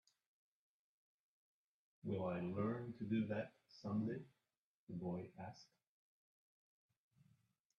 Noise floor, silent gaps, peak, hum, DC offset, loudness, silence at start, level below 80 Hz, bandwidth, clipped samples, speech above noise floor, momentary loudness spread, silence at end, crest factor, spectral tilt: under -90 dBFS; 4.57-4.87 s; -30 dBFS; none; under 0.1%; -46 LUFS; 2.05 s; -82 dBFS; 6.8 kHz; under 0.1%; over 45 dB; 13 LU; 2.15 s; 18 dB; -8.5 dB/octave